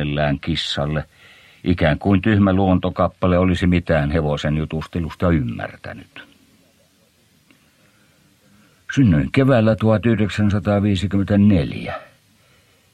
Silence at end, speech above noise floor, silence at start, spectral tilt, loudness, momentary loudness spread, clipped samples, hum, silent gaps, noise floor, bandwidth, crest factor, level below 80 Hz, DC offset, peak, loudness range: 0.9 s; 40 dB; 0 s; -7.5 dB/octave; -18 LUFS; 12 LU; under 0.1%; none; none; -58 dBFS; 10 kHz; 16 dB; -38 dBFS; under 0.1%; -2 dBFS; 10 LU